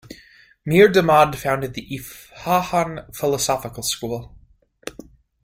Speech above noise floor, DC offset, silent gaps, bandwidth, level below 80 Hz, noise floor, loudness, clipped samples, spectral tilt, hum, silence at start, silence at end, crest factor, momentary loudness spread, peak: 35 dB; under 0.1%; none; 16.5 kHz; -50 dBFS; -54 dBFS; -19 LUFS; under 0.1%; -4.5 dB/octave; none; 0.1 s; 0.55 s; 20 dB; 22 LU; -2 dBFS